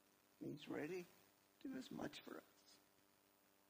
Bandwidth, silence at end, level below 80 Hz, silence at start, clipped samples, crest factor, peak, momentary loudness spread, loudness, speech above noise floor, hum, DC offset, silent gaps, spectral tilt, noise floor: 15 kHz; 0.2 s; -88 dBFS; 0.05 s; under 0.1%; 20 dB; -36 dBFS; 18 LU; -53 LUFS; 25 dB; none; under 0.1%; none; -5 dB/octave; -77 dBFS